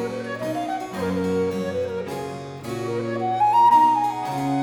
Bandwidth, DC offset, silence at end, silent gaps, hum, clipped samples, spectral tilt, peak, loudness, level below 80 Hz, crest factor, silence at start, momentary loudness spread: 18.5 kHz; under 0.1%; 0 s; none; none; under 0.1%; -6 dB/octave; -6 dBFS; -22 LUFS; -60 dBFS; 16 dB; 0 s; 15 LU